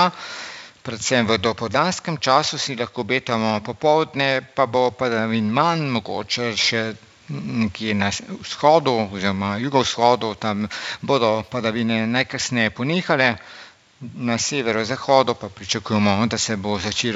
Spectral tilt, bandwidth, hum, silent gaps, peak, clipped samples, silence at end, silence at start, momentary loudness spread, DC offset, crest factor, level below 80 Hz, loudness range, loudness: -4 dB/octave; 8 kHz; none; none; -2 dBFS; under 0.1%; 0 s; 0 s; 11 LU; under 0.1%; 20 dB; -56 dBFS; 2 LU; -21 LUFS